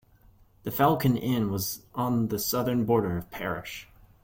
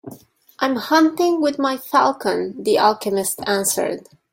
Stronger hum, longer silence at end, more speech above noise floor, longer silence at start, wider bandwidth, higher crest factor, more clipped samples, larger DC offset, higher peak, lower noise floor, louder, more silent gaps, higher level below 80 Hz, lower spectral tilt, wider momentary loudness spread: neither; about the same, 0.4 s vs 0.35 s; first, 31 dB vs 26 dB; first, 0.65 s vs 0.05 s; about the same, 17 kHz vs 16.5 kHz; about the same, 18 dB vs 18 dB; neither; neither; second, -10 dBFS vs -2 dBFS; first, -58 dBFS vs -44 dBFS; second, -27 LUFS vs -19 LUFS; neither; first, -54 dBFS vs -64 dBFS; first, -5.5 dB/octave vs -3 dB/octave; first, 11 LU vs 7 LU